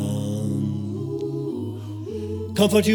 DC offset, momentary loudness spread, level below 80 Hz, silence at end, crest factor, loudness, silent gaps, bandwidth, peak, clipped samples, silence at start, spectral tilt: under 0.1%; 12 LU; -58 dBFS; 0 s; 16 dB; -26 LUFS; none; over 20 kHz; -6 dBFS; under 0.1%; 0 s; -6 dB/octave